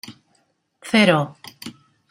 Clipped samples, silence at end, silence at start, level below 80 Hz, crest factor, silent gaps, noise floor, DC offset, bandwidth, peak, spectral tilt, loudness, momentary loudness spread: under 0.1%; 0.4 s; 0.1 s; -64 dBFS; 22 dB; none; -66 dBFS; under 0.1%; 15.5 kHz; -2 dBFS; -5.5 dB/octave; -18 LUFS; 24 LU